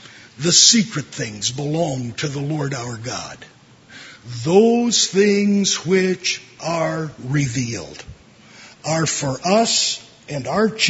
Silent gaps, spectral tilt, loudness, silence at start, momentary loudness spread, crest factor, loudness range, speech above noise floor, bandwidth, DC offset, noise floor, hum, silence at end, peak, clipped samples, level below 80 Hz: none; -3.5 dB/octave; -18 LUFS; 0 s; 15 LU; 20 dB; 6 LU; 25 dB; 8 kHz; under 0.1%; -44 dBFS; none; 0 s; 0 dBFS; under 0.1%; -54 dBFS